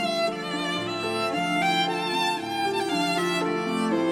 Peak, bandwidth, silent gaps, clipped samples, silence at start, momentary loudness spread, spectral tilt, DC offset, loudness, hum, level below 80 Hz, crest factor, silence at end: -12 dBFS; 19 kHz; none; under 0.1%; 0 s; 5 LU; -4 dB/octave; under 0.1%; -25 LUFS; none; -68 dBFS; 14 dB; 0 s